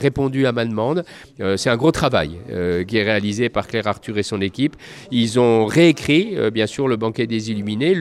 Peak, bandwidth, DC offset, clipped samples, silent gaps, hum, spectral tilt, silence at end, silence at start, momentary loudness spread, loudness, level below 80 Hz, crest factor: -2 dBFS; 13.5 kHz; under 0.1%; under 0.1%; none; none; -5.5 dB/octave; 0 s; 0 s; 9 LU; -19 LUFS; -46 dBFS; 16 dB